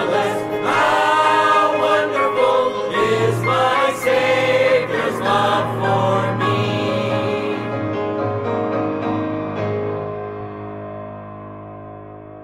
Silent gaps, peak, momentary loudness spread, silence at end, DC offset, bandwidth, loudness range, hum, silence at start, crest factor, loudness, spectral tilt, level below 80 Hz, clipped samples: none; -4 dBFS; 16 LU; 0 s; under 0.1%; 15.5 kHz; 8 LU; none; 0 s; 14 dB; -18 LUFS; -5.5 dB/octave; -56 dBFS; under 0.1%